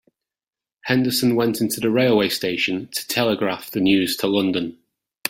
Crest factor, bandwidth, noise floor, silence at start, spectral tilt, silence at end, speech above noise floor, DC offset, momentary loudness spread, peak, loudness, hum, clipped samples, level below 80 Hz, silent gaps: 18 dB; 16.5 kHz; under -90 dBFS; 0.85 s; -4.5 dB/octave; 0 s; over 70 dB; under 0.1%; 6 LU; -2 dBFS; -20 LUFS; none; under 0.1%; -60 dBFS; none